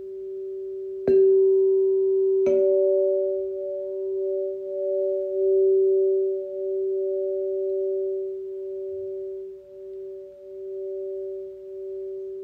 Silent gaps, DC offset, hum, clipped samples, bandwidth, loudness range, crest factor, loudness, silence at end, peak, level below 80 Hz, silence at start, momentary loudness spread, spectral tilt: none; under 0.1%; none; under 0.1%; 2.7 kHz; 13 LU; 14 dB; -24 LUFS; 0 s; -10 dBFS; -68 dBFS; 0 s; 17 LU; -9 dB/octave